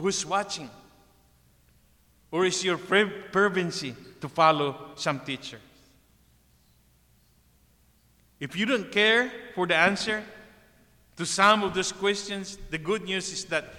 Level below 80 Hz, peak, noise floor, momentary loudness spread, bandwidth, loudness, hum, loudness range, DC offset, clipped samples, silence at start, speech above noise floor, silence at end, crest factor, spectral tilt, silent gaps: -60 dBFS; -6 dBFS; -62 dBFS; 14 LU; 16.5 kHz; -26 LUFS; 60 Hz at -60 dBFS; 11 LU; under 0.1%; under 0.1%; 0 s; 36 dB; 0 s; 22 dB; -3 dB/octave; none